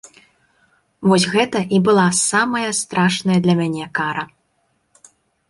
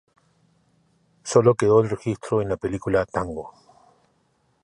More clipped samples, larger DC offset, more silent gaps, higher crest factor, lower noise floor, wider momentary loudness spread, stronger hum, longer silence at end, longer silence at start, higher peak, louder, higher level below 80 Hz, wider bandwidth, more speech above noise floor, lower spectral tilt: neither; neither; neither; about the same, 18 dB vs 20 dB; about the same, -66 dBFS vs -66 dBFS; second, 8 LU vs 16 LU; neither; about the same, 1.25 s vs 1.15 s; second, 1 s vs 1.25 s; about the same, -2 dBFS vs -4 dBFS; first, -17 LUFS vs -22 LUFS; second, -58 dBFS vs -50 dBFS; about the same, 11.5 kHz vs 11.5 kHz; first, 49 dB vs 45 dB; second, -4.5 dB/octave vs -6.5 dB/octave